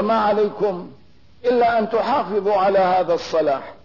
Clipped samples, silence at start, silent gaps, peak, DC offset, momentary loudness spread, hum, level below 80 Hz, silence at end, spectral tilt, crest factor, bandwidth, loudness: under 0.1%; 0 s; none; -8 dBFS; 0.4%; 7 LU; none; -56 dBFS; 0.1 s; -6 dB/octave; 12 dB; 6 kHz; -19 LUFS